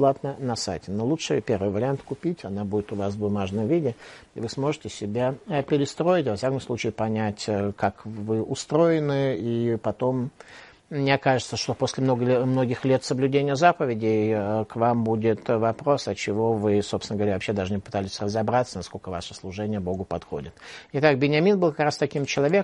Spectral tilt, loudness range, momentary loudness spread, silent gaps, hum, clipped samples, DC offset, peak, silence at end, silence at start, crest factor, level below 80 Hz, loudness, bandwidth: -6 dB/octave; 5 LU; 10 LU; none; none; under 0.1%; under 0.1%; -2 dBFS; 0 s; 0 s; 22 dB; -58 dBFS; -25 LUFS; 11.5 kHz